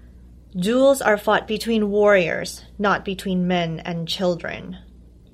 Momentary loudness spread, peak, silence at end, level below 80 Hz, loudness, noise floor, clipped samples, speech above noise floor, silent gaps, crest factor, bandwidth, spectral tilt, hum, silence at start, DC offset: 15 LU; -2 dBFS; 0.45 s; -48 dBFS; -20 LUFS; -45 dBFS; under 0.1%; 24 dB; none; 18 dB; 15.5 kHz; -5 dB/octave; none; 0.05 s; under 0.1%